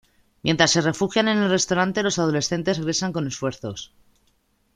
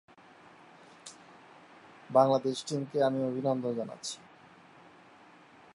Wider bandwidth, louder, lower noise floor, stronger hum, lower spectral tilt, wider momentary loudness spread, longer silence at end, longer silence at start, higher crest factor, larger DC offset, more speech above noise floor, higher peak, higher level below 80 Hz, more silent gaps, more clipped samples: about the same, 11.5 kHz vs 11.5 kHz; first, -22 LUFS vs -30 LUFS; first, -65 dBFS vs -57 dBFS; neither; second, -4 dB/octave vs -5.5 dB/octave; second, 12 LU vs 24 LU; second, 0.9 s vs 1.6 s; second, 0.45 s vs 1.05 s; about the same, 22 dB vs 24 dB; neither; first, 43 dB vs 27 dB; first, 0 dBFS vs -10 dBFS; first, -56 dBFS vs -82 dBFS; neither; neither